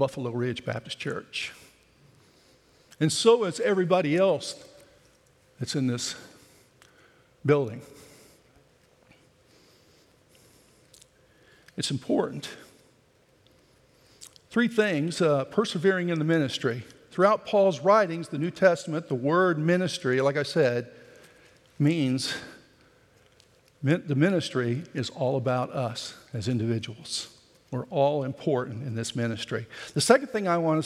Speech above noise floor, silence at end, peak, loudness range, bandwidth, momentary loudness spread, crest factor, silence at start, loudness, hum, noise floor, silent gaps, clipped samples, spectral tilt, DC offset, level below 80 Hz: 37 dB; 0 s; -4 dBFS; 10 LU; 14.5 kHz; 12 LU; 24 dB; 0 s; -26 LUFS; none; -62 dBFS; none; under 0.1%; -5.5 dB/octave; under 0.1%; -72 dBFS